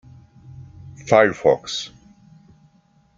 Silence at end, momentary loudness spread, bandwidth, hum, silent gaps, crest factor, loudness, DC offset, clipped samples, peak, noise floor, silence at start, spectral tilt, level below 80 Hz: 1.3 s; 26 LU; 7.8 kHz; none; none; 22 dB; -18 LUFS; under 0.1%; under 0.1%; -2 dBFS; -58 dBFS; 0.6 s; -4.5 dB/octave; -56 dBFS